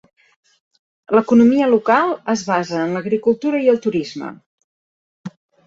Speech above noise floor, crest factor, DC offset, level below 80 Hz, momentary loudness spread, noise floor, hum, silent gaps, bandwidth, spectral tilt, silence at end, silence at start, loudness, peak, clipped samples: over 74 dB; 18 dB; under 0.1%; -60 dBFS; 21 LU; under -90 dBFS; none; 4.46-4.58 s, 4.64-5.24 s; 7.6 kHz; -6 dB/octave; 0.35 s; 1.1 s; -17 LUFS; -2 dBFS; under 0.1%